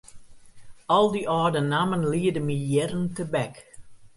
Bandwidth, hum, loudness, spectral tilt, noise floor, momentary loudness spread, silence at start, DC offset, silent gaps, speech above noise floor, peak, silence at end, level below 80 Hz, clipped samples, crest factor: 11.5 kHz; none; -25 LUFS; -6 dB/octave; -45 dBFS; 8 LU; 0.15 s; under 0.1%; none; 21 dB; -8 dBFS; 0.1 s; -56 dBFS; under 0.1%; 18 dB